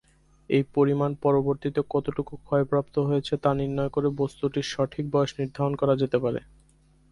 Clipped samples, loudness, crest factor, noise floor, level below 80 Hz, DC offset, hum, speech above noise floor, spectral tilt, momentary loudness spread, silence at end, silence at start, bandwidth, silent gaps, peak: under 0.1%; -26 LUFS; 18 dB; -60 dBFS; -54 dBFS; under 0.1%; none; 34 dB; -7.5 dB/octave; 5 LU; 0.75 s; 0.5 s; 11.5 kHz; none; -8 dBFS